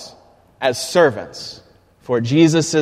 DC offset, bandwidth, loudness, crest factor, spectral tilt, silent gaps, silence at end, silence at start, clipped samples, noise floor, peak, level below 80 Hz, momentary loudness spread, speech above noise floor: under 0.1%; 14.5 kHz; -16 LUFS; 18 dB; -5 dB/octave; none; 0 s; 0 s; under 0.1%; -49 dBFS; 0 dBFS; -56 dBFS; 18 LU; 32 dB